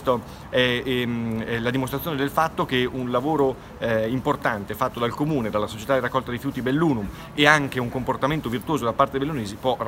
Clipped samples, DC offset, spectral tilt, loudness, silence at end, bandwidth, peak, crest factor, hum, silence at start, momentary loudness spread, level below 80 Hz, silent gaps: under 0.1%; under 0.1%; -5.5 dB/octave; -24 LUFS; 0 s; 16 kHz; 0 dBFS; 24 dB; none; 0 s; 6 LU; -48 dBFS; none